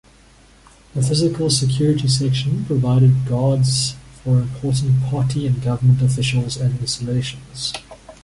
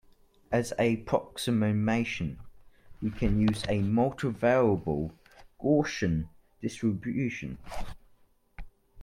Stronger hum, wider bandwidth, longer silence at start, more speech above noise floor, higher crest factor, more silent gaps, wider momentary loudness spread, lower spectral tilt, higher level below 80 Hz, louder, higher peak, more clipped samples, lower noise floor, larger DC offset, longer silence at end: neither; second, 11.5 kHz vs 15.5 kHz; first, 0.95 s vs 0.5 s; about the same, 31 dB vs 34 dB; about the same, 14 dB vs 18 dB; neither; second, 10 LU vs 13 LU; about the same, -5.5 dB/octave vs -6.5 dB/octave; about the same, -44 dBFS vs -46 dBFS; first, -19 LUFS vs -29 LUFS; first, -4 dBFS vs -12 dBFS; neither; second, -49 dBFS vs -62 dBFS; neither; about the same, 0.1 s vs 0 s